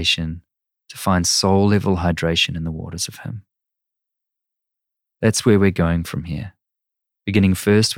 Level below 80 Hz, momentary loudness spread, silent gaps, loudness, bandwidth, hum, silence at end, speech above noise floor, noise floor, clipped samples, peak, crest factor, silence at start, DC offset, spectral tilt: -42 dBFS; 17 LU; none; -19 LUFS; 17 kHz; none; 0 s; 65 dB; -83 dBFS; under 0.1%; -2 dBFS; 18 dB; 0 s; under 0.1%; -4.5 dB/octave